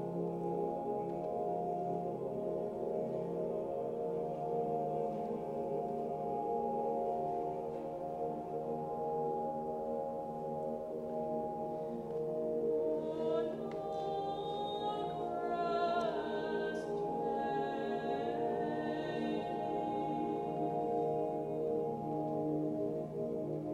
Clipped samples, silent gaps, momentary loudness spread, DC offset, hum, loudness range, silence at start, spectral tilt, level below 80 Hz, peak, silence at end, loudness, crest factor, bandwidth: under 0.1%; none; 4 LU; under 0.1%; none; 2 LU; 0 s; -8 dB/octave; -68 dBFS; -22 dBFS; 0 s; -38 LUFS; 14 dB; 12 kHz